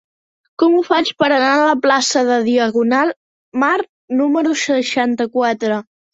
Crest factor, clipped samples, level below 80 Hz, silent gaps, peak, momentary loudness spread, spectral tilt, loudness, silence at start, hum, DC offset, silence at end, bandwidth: 14 dB; under 0.1%; -64 dBFS; 3.16-3.52 s, 3.89-4.08 s; -2 dBFS; 7 LU; -3 dB/octave; -16 LUFS; 0.6 s; none; under 0.1%; 0.3 s; 8 kHz